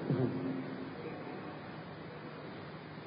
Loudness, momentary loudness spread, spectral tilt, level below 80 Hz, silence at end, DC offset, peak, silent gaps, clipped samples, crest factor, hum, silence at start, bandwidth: -42 LUFS; 12 LU; -6.5 dB/octave; -70 dBFS; 0 s; under 0.1%; -20 dBFS; none; under 0.1%; 20 dB; none; 0 s; 5 kHz